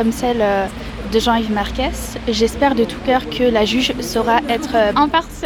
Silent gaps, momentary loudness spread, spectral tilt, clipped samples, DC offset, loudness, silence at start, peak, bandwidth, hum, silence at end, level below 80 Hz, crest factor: none; 6 LU; -4.5 dB/octave; under 0.1%; under 0.1%; -17 LUFS; 0 s; 0 dBFS; 19 kHz; none; 0 s; -32 dBFS; 16 dB